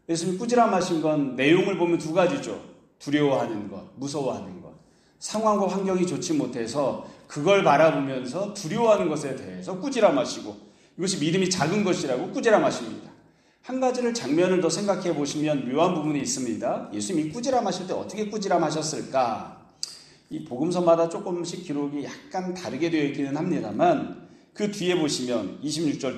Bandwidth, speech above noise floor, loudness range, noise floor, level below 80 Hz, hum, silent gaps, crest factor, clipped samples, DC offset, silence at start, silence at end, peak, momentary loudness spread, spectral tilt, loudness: 13 kHz; 33 dB; 4 LU; -58 dBFS; -66 dBFS; none; none; 20 dB; under 0.1%; under 0.1%; 0.1 s; 0 s; -6 dBFS; 14 LU; -5 dB/octave; -25 LUFS